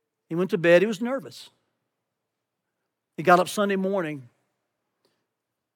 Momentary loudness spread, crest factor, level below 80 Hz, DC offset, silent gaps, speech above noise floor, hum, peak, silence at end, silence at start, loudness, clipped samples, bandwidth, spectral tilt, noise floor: 17 LU; 22 dB; under -90 dBFS; under 0.1%; none; 60 dB; none; -4 dBFS; 1.55 s; 0.3 s; -23 LUFS; under 0.1%; 18 kHz; -5.5 dB/octave; -83 dBFS